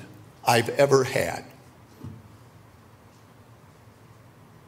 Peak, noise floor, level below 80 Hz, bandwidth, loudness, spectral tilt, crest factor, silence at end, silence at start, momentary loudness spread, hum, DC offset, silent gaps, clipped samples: -4 dBFS; -52 dBFS; -62 dBFS; 16 kHz; -23 LUFS; -4.5 dB/octave; 26 dB; 2.5 s; 0 s; 27 LU; none; under 0.1%; none; under 0.1%